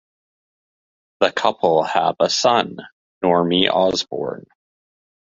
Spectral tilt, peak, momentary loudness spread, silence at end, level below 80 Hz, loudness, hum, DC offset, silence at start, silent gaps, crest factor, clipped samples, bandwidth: -4 dB/octave; -2 dBFS; 12 LU; 0.85 s; -58 dBFS; -18 LUFS; none; under 0.1%; 1.2 s; 2.92-3.21 s; 20 dB; under 0.1%; 7.8 kHz